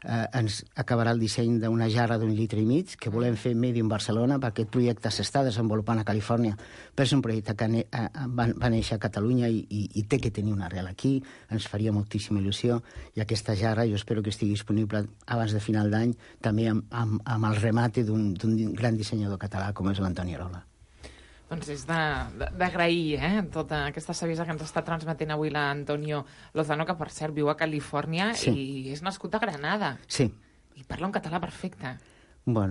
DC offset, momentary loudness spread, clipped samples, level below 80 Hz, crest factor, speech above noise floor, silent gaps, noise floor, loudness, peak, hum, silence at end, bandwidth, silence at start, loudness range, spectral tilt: under 0.1%; 8 LU; under 0.1%; -48 dBFS; 16 dB; 22 dB; none; -50 dBFS; -28 LUFS; -12 dBFS; none; 0 s; 11.5 kHz; 0 s; 4 LU; -6 dB/octave